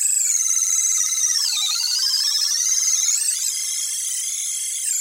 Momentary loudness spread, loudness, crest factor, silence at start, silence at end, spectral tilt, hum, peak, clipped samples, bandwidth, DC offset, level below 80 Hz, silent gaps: 6 LU; -18 LUFS; 14 dB; 0 s; 0 s; 8.5 dB/octave; none; -8 dBFS; under 0.1%; 16 kHz; under 0.1%; -86 dBFS; none